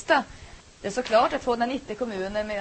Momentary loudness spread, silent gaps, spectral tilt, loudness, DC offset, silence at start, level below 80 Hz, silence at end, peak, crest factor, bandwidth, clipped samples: 14 LU; none; -4 dB/octave; -26 LUFS; under 0.1%; 0 s; -50 dBFS; 0 s; -6 dBFS; 20 dB; 8.8 kHz; under 0.1%